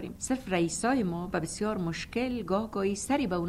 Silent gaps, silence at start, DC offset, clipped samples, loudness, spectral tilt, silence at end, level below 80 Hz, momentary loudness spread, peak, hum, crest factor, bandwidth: none; 0 s; under 0.1%; under 0.1%; -31 LUFS; -5 dB/octave; 0 s; -52 dBFS; 5 LU; -14 dBFS; none; 16 dB; 15.5 kHz